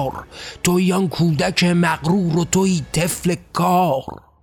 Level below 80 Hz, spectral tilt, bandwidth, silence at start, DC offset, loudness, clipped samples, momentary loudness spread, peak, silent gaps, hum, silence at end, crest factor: -46 dBFS; -5 dB/octave; 16.5 kHz; 0 s; under 0.1%; -18 LUFS; under 0.1%; 8 LU; -4 dBFS; none; none; 0.25 s; 16 dB